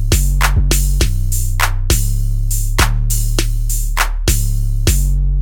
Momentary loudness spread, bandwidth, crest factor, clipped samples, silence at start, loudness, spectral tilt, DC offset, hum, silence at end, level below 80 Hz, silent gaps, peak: 4 LU; 19.5 kHz; 14 dB; under 0.1%; 0 s; -17 LUFS; -3.5 dB/octave; under 0.1%; none; 0 s; -14 dBFS; none; 0 dBFS